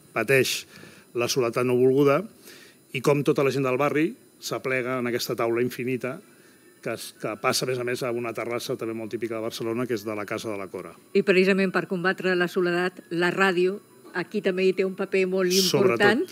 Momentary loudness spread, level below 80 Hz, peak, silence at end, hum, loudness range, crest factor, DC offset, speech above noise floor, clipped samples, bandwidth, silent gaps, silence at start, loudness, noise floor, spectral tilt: 13 LU; -78 dBFS; -6 dBFS; 0 s; none; 6 LU; 18 dB; under 0.1%; 29 dB; under 0.1%; 16 kHz; none; 0.15 s; -25 LUFS; -54 dBFS; -4.5 dB/octave